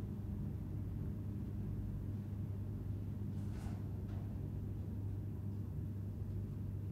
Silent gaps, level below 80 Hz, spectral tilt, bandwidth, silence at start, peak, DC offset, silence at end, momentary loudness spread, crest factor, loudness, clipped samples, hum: none; -52 dBFS; -9.5 dB/octave; 14.5 kHz; 0 s; -32 dBFS; under 0.1%; 0 s; 1 LU; 10 dB; -44 LUFS; under 0.1%; none